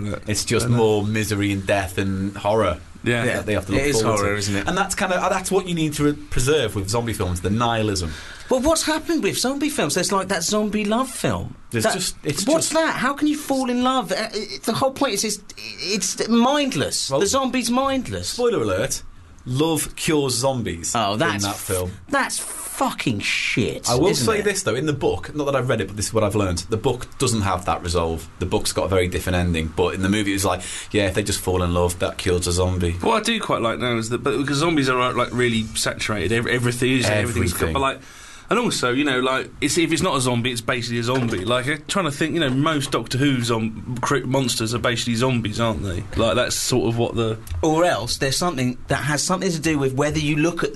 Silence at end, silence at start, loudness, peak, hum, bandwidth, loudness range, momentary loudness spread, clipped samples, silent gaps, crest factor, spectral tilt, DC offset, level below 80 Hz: 0 s; 0 s; -21 LUFS; -8 dBFS; none; 12.5 kHz; 1 LU; 5 LU; under 0.1%; none; 14 dB; -4.5 dB/octave; under 0.1%; -40 dBFS